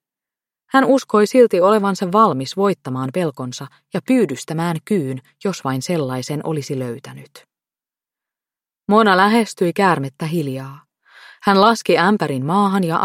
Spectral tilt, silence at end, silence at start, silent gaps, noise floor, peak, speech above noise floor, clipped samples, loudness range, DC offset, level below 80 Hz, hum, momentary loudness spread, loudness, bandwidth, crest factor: -6 dB/octave; 0 s; 0.75 s; none; under -90 dBFS; 0 dBFS; over 73 dB; under 0.1%; 8 LU; under 0.1%; -66 dBFS; none; 14 LU; -17 LUFS; 15.5 kHz; 18 dB